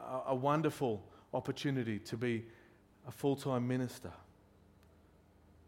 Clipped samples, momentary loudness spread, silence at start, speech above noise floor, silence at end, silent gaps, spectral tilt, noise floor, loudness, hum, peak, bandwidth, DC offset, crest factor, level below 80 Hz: under 0.1%; 19 LU; 0 s; 28 dB; 1.45 s; none; -6.5 dB/octave; -65 dBFS; -37 LUFS; none; -18 dBFS; 16.5 kHz; under 0.1%; 20 dB; -70 dBFS